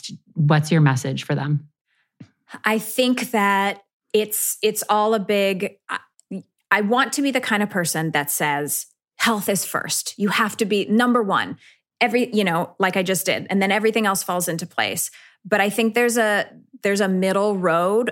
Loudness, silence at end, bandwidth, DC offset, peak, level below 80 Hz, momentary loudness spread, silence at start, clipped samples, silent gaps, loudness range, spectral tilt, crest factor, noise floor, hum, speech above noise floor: -21 LUFS; 0 s; 17 kHz; under 0.1%; -2 dBFS; -72 dBFS; 8 LU; 0.05 s; under 0.1%; 1.81-1.85 s, 3.93-4.00 s; 2 LU; -4 dB/octave; 18 dB; -49 dBFS; none; 28 dB